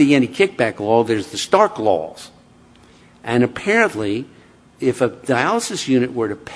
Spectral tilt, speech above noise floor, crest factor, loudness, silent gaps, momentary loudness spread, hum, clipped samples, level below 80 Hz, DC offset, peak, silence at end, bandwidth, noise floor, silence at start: -5 dB/octave; 31 dB; 18 dB; -18 LUFS; none; 9 LU; none; under 0.1%; -58 dBFS; under 0.1%; 0 dBFS; 0 s; 11 kHz; -48 dBFS; 0 s